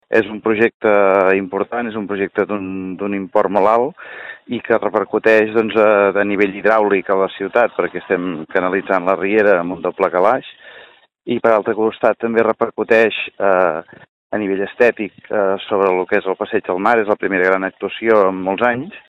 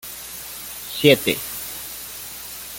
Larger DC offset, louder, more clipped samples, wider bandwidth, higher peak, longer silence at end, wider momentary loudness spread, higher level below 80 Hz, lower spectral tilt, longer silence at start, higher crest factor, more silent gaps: neither; first, -16 LUFS vs -23 LUFS; neither; second, 7.2 kHz vs 17 kHz; about the same, 0 dBFS vs -2 dBFS; about the same, 0.1 s vs 0 s; second, 9 LU vs 16 LU; second, -60 dBFS vs -54 dBFS; first, -7 dB/octave vs -3.5 dB/octave; about the same, 0.1 s vs 0 s; second, 16 dB vs 22 dB; first, 0.74-0.80 s, 14.09-14.30 s vs none